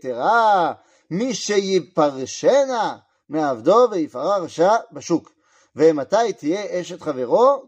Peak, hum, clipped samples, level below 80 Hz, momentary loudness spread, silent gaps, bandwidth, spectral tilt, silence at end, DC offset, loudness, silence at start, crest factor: -4 dBFS; none; under 0.1%; -74 dBFS; 11 LU; none; 8.8 kHz; -4.5 dB/octave; 0.05 s; under 0.1%; -20 LUFS; 0.05 s; 16 dB